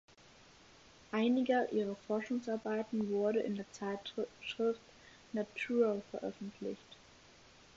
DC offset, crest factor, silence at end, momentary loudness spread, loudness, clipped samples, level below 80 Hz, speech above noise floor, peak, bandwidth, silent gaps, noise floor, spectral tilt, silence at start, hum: under 0.1%; 18 dB; 0.8 s; 12 LU; -37 LUFS; under 0.1%; -74 dBFS; 25 dB; -20 dBFS; 7.6 kHz; none; -62 dBFS; -4.5 dB/octave; 1.1 s; none